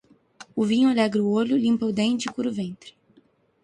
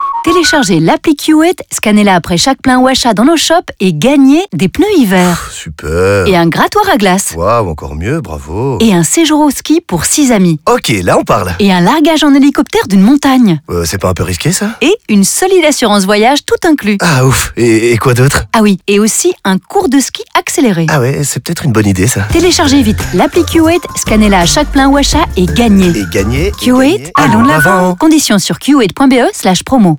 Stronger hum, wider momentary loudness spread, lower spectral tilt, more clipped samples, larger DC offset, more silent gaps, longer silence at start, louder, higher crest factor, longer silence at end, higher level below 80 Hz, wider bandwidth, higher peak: neither; first, 13 LU vs 6 LU; about the same, -5.5 dB/octave vs -4.5 dB/octave; neither; neither; neither; first, 0.4 s vs 0 s; second, -23 LUFS vs -8 LUFS; first, 16 dB vs 8 dB; first, 0.75 s vs 0 s; second, -64 dBFS vs -28 dBFS; second, 11 kHz vs over 20 kHz; second, -10 dBFS vs 0 dBFS